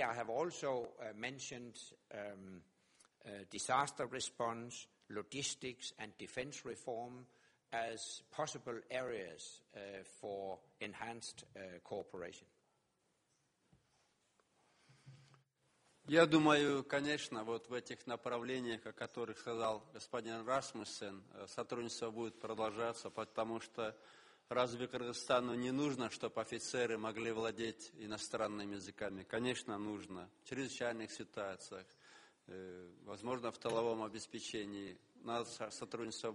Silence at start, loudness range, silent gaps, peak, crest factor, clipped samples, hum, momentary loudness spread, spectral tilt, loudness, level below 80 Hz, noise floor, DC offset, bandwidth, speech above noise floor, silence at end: 0 s; 11 LU; none; -16 dBFS; 26 dB; under 0.1%; none; 15 LU; -4 dB/octave; -42 LUFS; -78 dBFS; -81 dBFS; under 0.1%; 11.5 kHz; 39 dB; 0 s